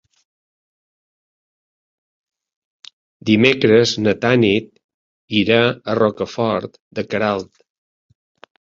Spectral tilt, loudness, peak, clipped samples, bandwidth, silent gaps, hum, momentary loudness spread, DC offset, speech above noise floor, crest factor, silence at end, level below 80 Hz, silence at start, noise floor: -5.5 dB/octave; -17 LUFS; -2 dBFS; under 0.1%; 7.6 kHz; 4.84-5.28 s, 6.80-6.91 s; none; 12 LU; under 0.1%; over 74 dB; 18 dB; 1.2 s; -54 dBFS; 3.25 s; under -90 dBFS